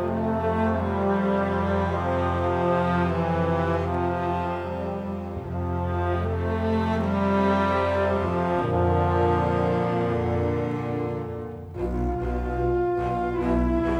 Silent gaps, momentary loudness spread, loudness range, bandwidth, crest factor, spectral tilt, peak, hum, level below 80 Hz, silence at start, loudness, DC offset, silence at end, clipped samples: none; 8 LU; 4 LU; 8.4 kHz; 14 dB; -8.5 dB/octave; -10 dBFS; none; -38 dBFS; 0 s; -25 LUFS; under 0.1%; 0 s; under 0.1%